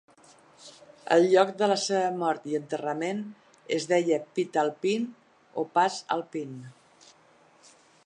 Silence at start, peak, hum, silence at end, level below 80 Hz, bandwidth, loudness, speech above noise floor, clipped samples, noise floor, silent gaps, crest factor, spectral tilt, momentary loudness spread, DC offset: 0.6 s; -6 dBFS; none; 1.35 s; -82 dBFS; 10.5 kHz; -27 LUFS; 33 dB; under 0.1%; -60 dBFS; none; 22 dB; -4.5 dB/octave; 15 LU; under 0.1%